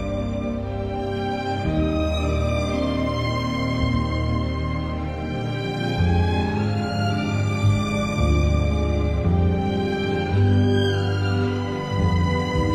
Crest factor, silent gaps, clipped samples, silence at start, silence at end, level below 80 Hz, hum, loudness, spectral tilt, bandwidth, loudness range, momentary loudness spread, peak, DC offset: 14 dB; none; under 0.1%; 0 s; 0 s; -30 dBFS; none; -23 LUFS; -7 dB/octave; 9.2 kHz; 3 LU; 6 LU; -8 dBFS; under 0.1%